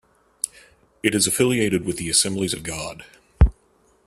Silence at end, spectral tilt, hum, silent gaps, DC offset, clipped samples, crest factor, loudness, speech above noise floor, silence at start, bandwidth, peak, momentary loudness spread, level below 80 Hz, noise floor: 0.55 s; -3.5 dB/octave; none; none; under 0.1%; under 0.1%; 22 dB; -21 LUFS; 38 dB; 0.45 s; 14.5 kHz; -2 dBFS; 11 LU; -30 dBFS; -60 dBFS